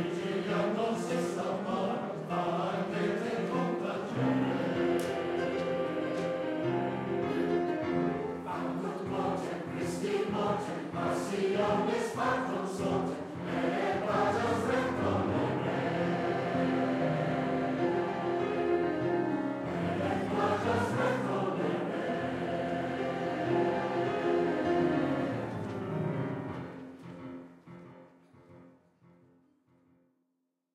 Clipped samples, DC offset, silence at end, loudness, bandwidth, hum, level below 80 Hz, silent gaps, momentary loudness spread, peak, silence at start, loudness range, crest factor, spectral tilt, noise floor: under 0.1%; under 0.1%; 2.05 s; -32 LUFS; 13.5 kHz; none; -66 dBFS; none; 6 LU; -16 dBFS; 0 s; 3 LU; 16 dB; -6.5 dB/octave; -81 dBFS